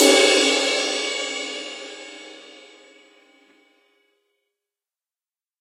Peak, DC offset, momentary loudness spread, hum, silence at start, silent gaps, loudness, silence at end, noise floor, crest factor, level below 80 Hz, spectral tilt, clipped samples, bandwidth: -2 dBFS; under 0.1%; 25 LU; none; 0 s; none; -19 LUFS; 3.2 s; under -90 dBFS; 22 dB; under -90 dBFS; 1 dB/octave; under 0.1%; 16 kHz